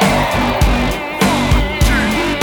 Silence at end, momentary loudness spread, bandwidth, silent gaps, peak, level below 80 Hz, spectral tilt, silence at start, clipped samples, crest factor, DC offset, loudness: 0 s; 3 LU; 20 kHz; none; -2 dBFS; -20 dBFS; -5 dB/octave; 0 s; under 0.1%; 12 dB; under 0.1%; -15 LUFS